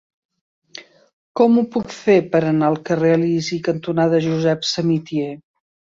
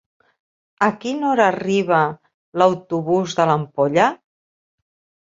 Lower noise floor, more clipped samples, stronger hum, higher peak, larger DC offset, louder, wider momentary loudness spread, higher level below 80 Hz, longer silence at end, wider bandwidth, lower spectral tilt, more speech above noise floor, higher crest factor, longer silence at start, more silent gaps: second, -42 dBFS vs under -90 dBFS; neither; neither; about the same, -2 dBFS vs 0 dBFS; neither; about the same, -18 LUFS vs -19 LUFS; first, 18 LU vs 7 LU; about the same, -60 dBFS vs -64 dBFS; second, 0.6 s vs 1.05 s; about the same, 7.8 kHz vs 7.8 kHz; about the same, -6.5 dB/octave vs -6 dB/octave; second, 25 dB vs over 72 dB; about the same, 16 dB vs 20 dB; about the same, 0.75 s vs 0.8 s; about the same, 1.13-1.35 s vs 2.34-2.52 s